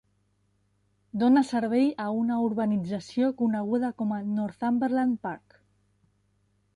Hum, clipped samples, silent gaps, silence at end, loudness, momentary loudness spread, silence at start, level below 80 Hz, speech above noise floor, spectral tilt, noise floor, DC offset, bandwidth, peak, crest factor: 50 Hz at -55 dBFS; under 0.1%; none; 1.4 s; -27 LUFS; 9 LU; 1.15 s; -68 dBFS; 44 dB; -7.5 dB/octave; -70 dBFS; under 0.1%; 10.5 kHz; -10 dBFS; 18 dB